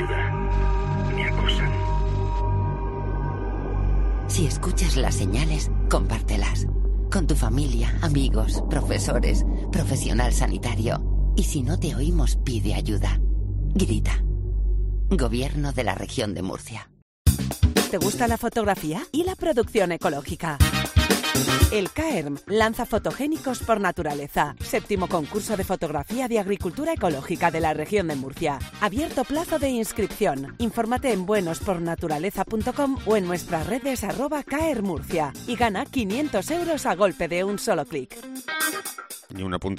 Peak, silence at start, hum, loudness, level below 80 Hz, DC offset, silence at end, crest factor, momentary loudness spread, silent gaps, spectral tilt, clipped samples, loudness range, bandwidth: -4 dBFS; 0 s; none; -25 LUFS; -28 dBFS; under 0.1%; 0 s; 18 dB; 5 LU; 17.02-17.25 s; -5 dB/octave; under 0.1%; 3 LU; 16 kHz